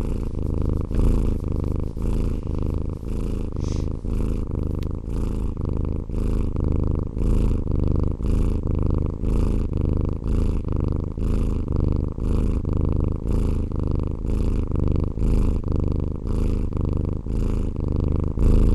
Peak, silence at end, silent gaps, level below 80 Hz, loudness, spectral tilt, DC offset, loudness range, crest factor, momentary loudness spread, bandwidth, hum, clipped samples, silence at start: -8 dBFS; 0 s; none; -24 dBFS; -25 LUFS; -9.5 dB/octave; under 0.1%; 3 LU; 14 dB; 4 LU; 11 kHz; none; under 0.1%; 0 s